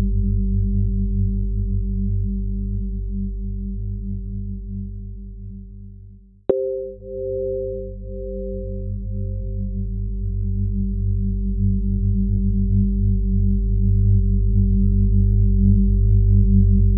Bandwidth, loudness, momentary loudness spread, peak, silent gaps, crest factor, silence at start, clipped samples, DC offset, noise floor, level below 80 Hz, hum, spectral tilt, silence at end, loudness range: 1.1 kHz; -22 LUFS; 14 LU; -4 dBFS; none; 16 dB; 0 s; under 0.1%; under 0.1%; -44 dBFS; -22 dBFS; 50 Hz at -40 dBFS; -16 dB/octave; 0 s; 10 LU